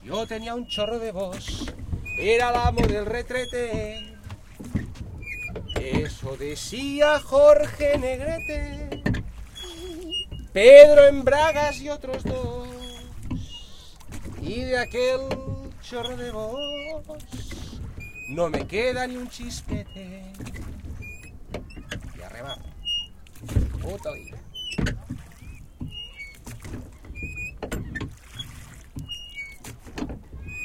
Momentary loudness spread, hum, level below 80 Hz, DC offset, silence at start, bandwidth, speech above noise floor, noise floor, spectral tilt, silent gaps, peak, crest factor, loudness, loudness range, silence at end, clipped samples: 19 LU; none; -38 dBFS; under 0.1%; 0.05 s; 14.5 kHz; 22 dB; -43 dBFS; -5 dB/octave; none; 0 dBFS; 24 dB; -22 LUFS; 20 LU; 0 s; under 0.1%